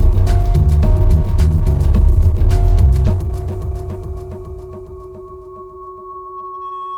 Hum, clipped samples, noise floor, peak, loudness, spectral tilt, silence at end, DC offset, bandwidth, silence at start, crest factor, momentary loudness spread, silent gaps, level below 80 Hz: none; under 0.1%; -33 dBFS; -2 dBFS; -16 LUFS; -8.5 dB/octave; 0 s; under 0.1%; 12 kHz; 0 s; 12 dB; 20 LU; none; -16 dBFS